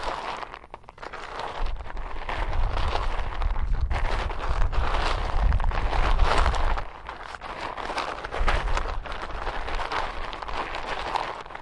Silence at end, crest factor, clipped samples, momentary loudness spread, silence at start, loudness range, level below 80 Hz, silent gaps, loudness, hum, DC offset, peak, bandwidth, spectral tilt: 0 s; 18 dB; under 0.1%; 11 LU; 0 s; 5 LU; -28 dBFS; none; -30 LUFS; none; under 0.1%; -8 dBFS; 10.5 kHz; -5 dB/octave